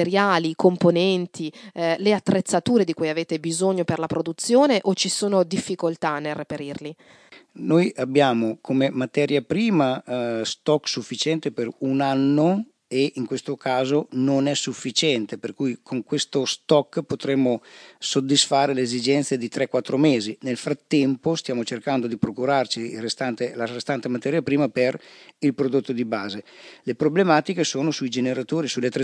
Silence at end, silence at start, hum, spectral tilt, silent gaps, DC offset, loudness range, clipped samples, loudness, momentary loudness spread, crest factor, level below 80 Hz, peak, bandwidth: 0 s; 0 s; none; -5 dB/octave; none; under 0.1%; 3 LU; under 0.1%; -23 LUFS; 9 LU; 20 dB; -68 dBFS; -4 dBFS; 10.5 kHz